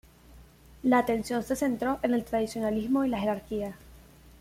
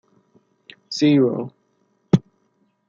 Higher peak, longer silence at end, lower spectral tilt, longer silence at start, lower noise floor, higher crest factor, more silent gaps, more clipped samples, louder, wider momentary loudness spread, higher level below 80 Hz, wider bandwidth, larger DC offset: second, -12 dBFS vs -2 dBFS; second, 0.1 s vs 0.7 s; second, -5.5 dB/octave vs -7 dB/octave; second, 0.3 s vs 0.9 s; second, -53 dBFS vs -66 dBFS; about the same, 18 dB vs 20 dB; neither; neither; second, -29 LUFS vs -20 LUFS; second, 8 LU vs 14 LU; about the same, -54 dBFS vs -56 dBFS; first, 16 kHz vs 7.6 kHz; neither